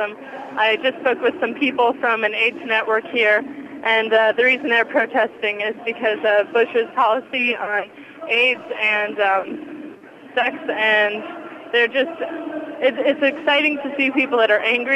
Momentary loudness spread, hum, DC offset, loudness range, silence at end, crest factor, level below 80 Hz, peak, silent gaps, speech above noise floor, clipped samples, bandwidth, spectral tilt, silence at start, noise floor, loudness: 12 LU; none; under 0.1%; 3 LU; 0 s; 14 dB; -72 dBFS; -6 dBFS; none; 21 dB; under 0.1%; 11 kHz; -4 dB/octave; 0 s; -40 dBFS; -18 LUFS